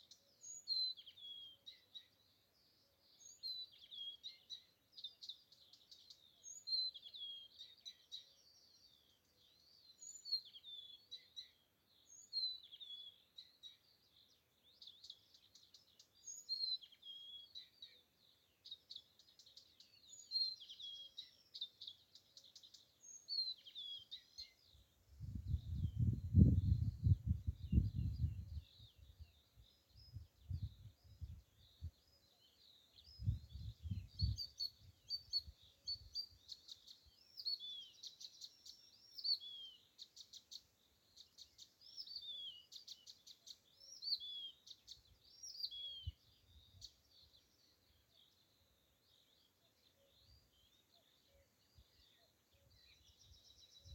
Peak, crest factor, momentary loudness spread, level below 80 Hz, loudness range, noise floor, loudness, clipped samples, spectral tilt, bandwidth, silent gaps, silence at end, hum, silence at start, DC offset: -16 dBFS; 32 dB; 23 LU; -56 dBFS; 16 LU; -77 dBFS; -45 LUFS; under 0.1%; -5 dB/octave; 16.5 kHz; none; 0 s; none; 0.1 s; under 0.1%